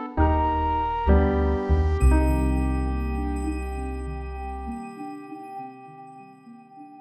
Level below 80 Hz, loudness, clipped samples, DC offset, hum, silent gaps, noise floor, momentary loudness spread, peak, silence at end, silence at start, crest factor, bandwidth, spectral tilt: -26 dBFS; -25 LUFS; under 0.1%; under 0.1%; none; none; -47 dBFS; 20 LU; -8 dBFS; 0 s; 0 s; 16 dB; 12 kHz; -8 dB/octave